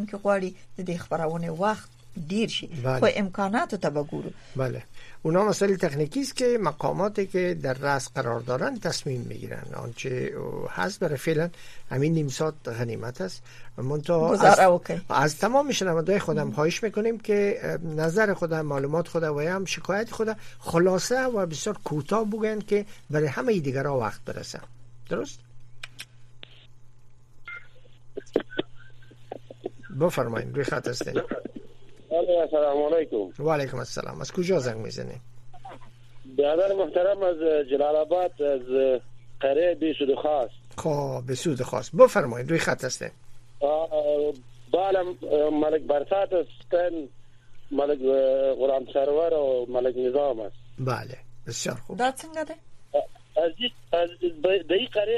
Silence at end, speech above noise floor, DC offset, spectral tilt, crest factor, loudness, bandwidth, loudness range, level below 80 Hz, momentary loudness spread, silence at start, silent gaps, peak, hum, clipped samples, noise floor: 0 s; 21 dB; under 0.1%; -5.5 dB/octave; 24 dB; -26 LUFS; 14 kHz; 7 LU; -54 dBFS; 13 LU; 0 s; none; -2 dBFS; none; under 0.1%; -46 dBFS